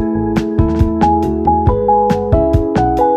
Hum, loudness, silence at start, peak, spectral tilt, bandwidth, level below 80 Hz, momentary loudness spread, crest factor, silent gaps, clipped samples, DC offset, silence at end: none; -14 LUFS; 0 s; 0 dBFS; -9 dB/octave; 13.5 kHz; -24 dBFS; 3 LU; 12 dB; none; under 0.1%; under 0.1%; 0 s